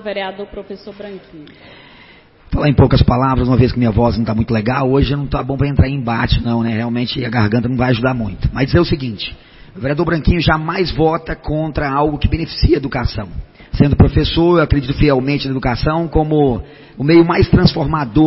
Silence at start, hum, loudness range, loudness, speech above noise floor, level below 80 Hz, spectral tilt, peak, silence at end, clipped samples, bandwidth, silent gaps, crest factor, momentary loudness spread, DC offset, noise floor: 0 s; none; 3 LU; -15 LUFS; 29 dB; -26 dBFS; -10.5 dB/octave; 0 dBFS; 0 s; under 0.1%; 5.8 kHz; none; 14 dB; 13 LU; under 0.1%; -44 dBFS